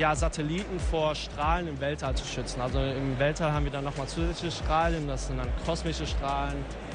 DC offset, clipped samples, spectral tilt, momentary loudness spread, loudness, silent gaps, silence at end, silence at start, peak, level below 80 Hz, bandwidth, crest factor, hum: under 0.1%; under 0.1%; -5 dB/octave; 6 LU; -30 LUFS; none; 0 s; 0 s; -12 dBFS; -36 dBFS; 10.5 kHz; 16 dB; none